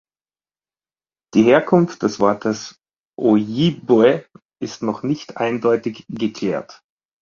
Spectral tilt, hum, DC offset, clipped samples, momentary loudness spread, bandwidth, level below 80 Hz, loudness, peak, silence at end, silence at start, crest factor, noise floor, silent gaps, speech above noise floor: -6.5 dB/octave; none; under 0.1%; under 0.1%; 13 LU; 7.4 kHz; -58 dBFS; -18 LUFS; -2 dBFS; 0.5 s; 1.35 s; 18 dB; under -90 dBFS; 2.98-3.12 s, 4.42-4.49 s; over 72 dB